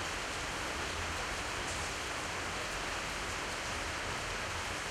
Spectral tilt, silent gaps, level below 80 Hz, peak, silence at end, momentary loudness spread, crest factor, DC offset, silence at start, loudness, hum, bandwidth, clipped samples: -2.5 dB/octave; none; -50 dBFS; -26 dBFS; 0 s; 1 LU; 12 dB; under 0.1%; 0 s; -37 LUFS; none; 16 kHz; under 0.1%